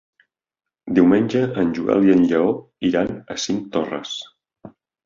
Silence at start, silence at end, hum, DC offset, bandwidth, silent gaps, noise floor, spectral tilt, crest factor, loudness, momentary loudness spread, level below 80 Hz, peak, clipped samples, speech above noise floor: 0.85 s; 0.4 s; none; under 0.1%; 7.6 kHz; none; -87 dBFS; -6 dB/octave; 18 dB; -19 LUFS; 12 LU; -54 dBFS; -2 dBFS; under 0.1%; 68 dB